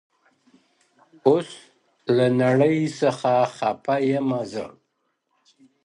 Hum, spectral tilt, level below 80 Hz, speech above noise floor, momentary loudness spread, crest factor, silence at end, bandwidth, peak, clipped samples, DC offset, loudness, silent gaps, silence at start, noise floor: none; -7 dB/octave; -68 dBFS; 52 dB; 14 LU; 18 dB; 1.15 s; 11 kHz; -4 dBFS; under 0.1%; under 0.1%; -22 LUFS; none; 1.25 s; -73 dBFS